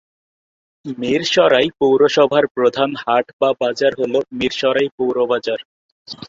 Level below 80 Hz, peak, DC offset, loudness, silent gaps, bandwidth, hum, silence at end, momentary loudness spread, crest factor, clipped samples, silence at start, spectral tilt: -58 dBFS; -2 dBFS; under 0.1%; -17 LUFS; 2.51-2.55 s, 3.33-3.39 s, 4.91-4.98 s, 5.65-6.05 s; 7.8 kHz; none; 0 s; 11 LU; 16 dB; under 0.1%; 0.85 s; -4.5 dB/octave